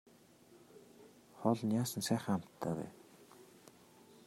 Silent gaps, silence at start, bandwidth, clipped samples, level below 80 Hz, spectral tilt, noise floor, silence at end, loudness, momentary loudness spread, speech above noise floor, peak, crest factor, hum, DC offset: none; 0.5 s; 16 kHz; under 0.1%; -78 dBFS; -5.5 dB/octave; -63 dBFS; 0.55 s; -37 LUFS; 25 LU; 27 dB; -16 dBFS; 24 dB; none; under 0.1%